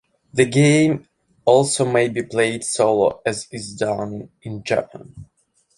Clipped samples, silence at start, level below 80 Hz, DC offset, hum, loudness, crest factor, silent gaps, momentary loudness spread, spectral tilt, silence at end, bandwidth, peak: under 0.1%; 0.35 s; -56 dBFS; under 0.1%; none; -19 LUFS; 18 dB; none; 16 LU; -5 dB/octave; 0.55 s; 11.5 kHz; -2 dBFS